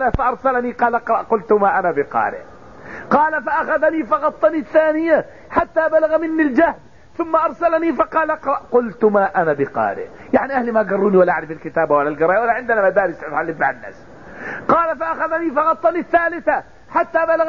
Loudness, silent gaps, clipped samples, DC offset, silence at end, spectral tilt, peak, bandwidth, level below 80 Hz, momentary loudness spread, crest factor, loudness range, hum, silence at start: -18 LUFS; none; under 0.1%; 0.5%; 0 s; -8 dB/octave; -2 dBFS; 6.8 kHz; -44 dBFS; 7 LU; 16 dB; 2 LU; none; 0 s